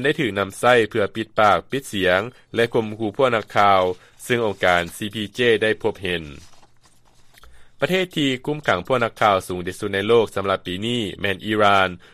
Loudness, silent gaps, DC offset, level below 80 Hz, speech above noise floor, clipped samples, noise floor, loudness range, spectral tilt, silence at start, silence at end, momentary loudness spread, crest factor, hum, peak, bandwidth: -20 LUFS; none; under 0.1%; -54 dBFS; 32 dB; under 0.1%; -52 dBFS; 4 LU; -5 dB/octave; 0 s; 0.15 s; 10 LU; 18 dB; none; -2 dBFS; 15 kHz